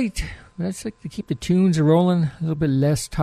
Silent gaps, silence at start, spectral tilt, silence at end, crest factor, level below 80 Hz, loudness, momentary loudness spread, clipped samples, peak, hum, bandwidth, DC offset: none; 0 s; -7 dB/octave; 0 s; 14 dB; -40 dBFS; -21 LUFS; 15 LU; under 0.1%; -6 dBFS; none; 13.5 kHz; under 0.1%